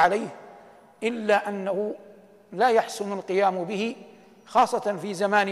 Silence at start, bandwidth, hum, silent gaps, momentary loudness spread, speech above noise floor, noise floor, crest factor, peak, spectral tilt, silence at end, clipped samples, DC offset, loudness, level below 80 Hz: 0 s; 14 kHz; none; none; 14 LU; 26 dB; -50 dBFS; 18 dB; -8 dBFS; -4.5 dB/octave; 0 s; under 0.1%; under 0.1%; -25 LUFS; -68 dBFS